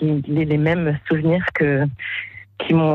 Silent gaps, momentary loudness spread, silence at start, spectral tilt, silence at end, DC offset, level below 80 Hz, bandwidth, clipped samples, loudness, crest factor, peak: none; 9 LU; 0 s; -9.5 dB/octave; 0 s; under 0.1%; -48 dBFS; 4.3 kHz; under 0.1%; -20 LUFS; 14 dB; -6 dBFS